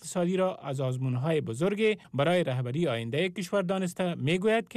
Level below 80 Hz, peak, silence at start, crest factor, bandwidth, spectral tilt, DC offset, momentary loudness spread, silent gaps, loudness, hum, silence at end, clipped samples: -68 dBFS; -16 dBFS; 0 s; 12 dB; 14 kHz; -6 dB/octave; under 0.1%; 4 LU; none; -29 LUFS; none; 0 s; under 0.1%